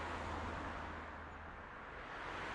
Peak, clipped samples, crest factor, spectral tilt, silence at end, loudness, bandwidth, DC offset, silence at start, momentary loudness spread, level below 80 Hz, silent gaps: -32 dBFS; under 0.1%; 14 dB; -5.5 dB/octave; 0 s; -47 LUFS; 11 kHz; under 0.1%; 0 s; 7 LU; -58 dBFS; none